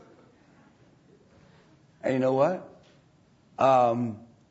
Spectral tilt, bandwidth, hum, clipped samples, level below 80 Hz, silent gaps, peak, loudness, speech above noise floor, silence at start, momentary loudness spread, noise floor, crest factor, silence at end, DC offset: -7.5 dB/octave; 8 kHz; none; under 0.1%; -72 dBFS; none; -10 dBFS; -25 LUFS; 37 dB; 2.05 s; 17 LU; -61 dBFS; 20 dB; 0.3 s; under 0.1%